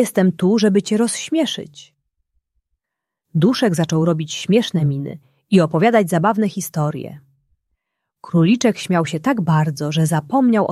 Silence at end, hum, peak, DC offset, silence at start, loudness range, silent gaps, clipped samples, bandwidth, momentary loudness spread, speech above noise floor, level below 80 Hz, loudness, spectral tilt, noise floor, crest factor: 0 s; none; -2 dBFS; under 0.1%; 0 s; 4 LU; none; under 0.1%; 14 kHz; 8 LU; 66 dB; -60 dBFS; -18 LUFS; -6 dB/octave; -82 dBFS; 16 dB